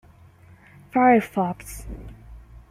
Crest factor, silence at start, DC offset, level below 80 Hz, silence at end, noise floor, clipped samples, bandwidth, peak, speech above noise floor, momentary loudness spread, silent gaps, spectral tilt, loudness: 20 dB; 0.95 s; under 0.1%; -44 dBFS; 0.15 s; -50 dBFS; under 0.1%; 15.5 kHz; -4 dBFS; 29 dB; 23 LU; none; -6.5 dB/octave; -21 LUFS